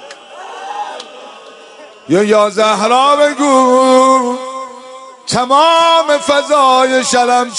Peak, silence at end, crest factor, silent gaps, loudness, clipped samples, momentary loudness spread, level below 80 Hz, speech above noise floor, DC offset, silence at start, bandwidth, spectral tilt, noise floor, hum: 0 dBFS; 0 s; 12 dB; none; -10 LUFS; under 0.1%; 20 LU; -60 dBFS; 26 dB; under 0.1%; 0 s; 11 kHz; -3 dB/octave; -36 dBFS; none